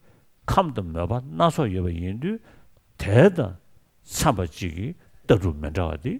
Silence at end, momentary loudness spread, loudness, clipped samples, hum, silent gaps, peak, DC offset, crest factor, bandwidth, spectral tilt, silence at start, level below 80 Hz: 0 s; 15 LU; -24 LUFS; under 0.1%; none; none; -2 dBFS; under 0.1%; 22 dB; 16 kHz; -6.5 dB/octave; 0.5 s; -40 dBFS